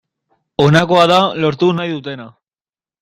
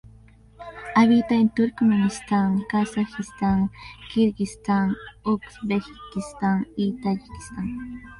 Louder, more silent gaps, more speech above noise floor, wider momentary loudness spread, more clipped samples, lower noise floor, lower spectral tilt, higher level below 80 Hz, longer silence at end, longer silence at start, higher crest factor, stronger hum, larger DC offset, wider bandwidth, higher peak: first, -13 LUFS vs -24 LUFS; neither; first, over 77 dB vs 27 dB; about the same, 16 LU vs 14 LU; neither; first, under -90 dBFS vs -50 dBFS; about the same, -6 dB/octave vs -6.5 dB/octave; about the same, -50 dBFS vs -50 dBFS; first, 0.75 s vs 0.05 s; about the same, 0.6 s vs 0.6 s; about the same, 16 dB vs 18 dB; neither; neither; about the same, 12.5 kHz vs 11.5 kHz; first, 0 dBFS vs -4 dBFS